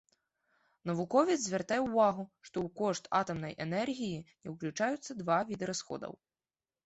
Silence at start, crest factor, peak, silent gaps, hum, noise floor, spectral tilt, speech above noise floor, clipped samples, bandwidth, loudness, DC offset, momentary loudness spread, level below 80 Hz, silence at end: 0.85 s; 20 dB; -14 dBFS; none; none; under -90 dBFS; -5 dB/octave; over 56 dB; under 0.1%; 8.2 kHz; -34 LUFS; under 0.1%; 14 LU; -70 dBFS; 0.7 s